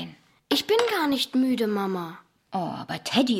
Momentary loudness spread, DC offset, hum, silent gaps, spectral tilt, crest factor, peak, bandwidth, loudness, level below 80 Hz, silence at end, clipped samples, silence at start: 11 LU; under 0.1%; none; none; -4.5 dB/octave; 20 dB; -6 dBFS; 16.5 kHz; -25 LUFS; -68 dBFS; 0 s; under 0.1%; 0 s